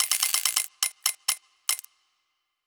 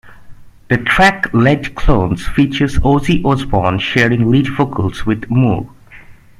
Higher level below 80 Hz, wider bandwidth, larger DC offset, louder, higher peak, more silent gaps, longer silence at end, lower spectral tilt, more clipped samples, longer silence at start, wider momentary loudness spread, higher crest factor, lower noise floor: second, -82 dBFS vs -26 dBFS; first, over 20 kHz vs 13.5 kHz; neither; second, -26 LUFS vs -14 LUFS; about the same, -2 dBFS vs 0 dBFS; neither; first, 0.85 s vs 0.25 s; second, 6 dB/octave vs -6.5 dB/octave; neither; about the same, 0 s vs 0.05 s; about the same, 7 LU vs 7 LU; first, 28 dB vs 14 dB; first, -77 dBFS vs -38 dBFS